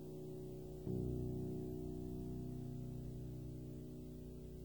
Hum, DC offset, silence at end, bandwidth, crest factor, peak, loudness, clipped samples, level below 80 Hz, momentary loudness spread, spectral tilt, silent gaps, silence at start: none; under 0.1%; 0 s; over 20 kHz; 16 dB; -30 dBFS; -48 LUFS; under 0.1%; -56 dBFS; 8 LU; -9 dB/octave; none; 0 s